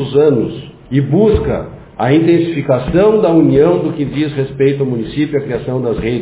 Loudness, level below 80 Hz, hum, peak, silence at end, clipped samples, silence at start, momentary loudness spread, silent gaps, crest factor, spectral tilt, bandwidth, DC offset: -13 LUFS; -34 dBFS; none; 0 dBFS; 0 s; under 0.1%; 0 s; 9 LU; none; 12 dB; -12 dB/octave; 4 kHz; under 0.1%